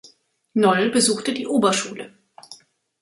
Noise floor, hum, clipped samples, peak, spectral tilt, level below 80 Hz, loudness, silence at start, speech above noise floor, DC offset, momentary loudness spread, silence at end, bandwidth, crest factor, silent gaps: -54 dBFS; none; under 0.1%; -4 dBFS; -3.5 dB/octave; -66 dBFS; -20 LUFS; 0.55 s; 34 dB; under 0.1%; 16 LU; 0.45 s; 11.5 kHz; 18 dB; none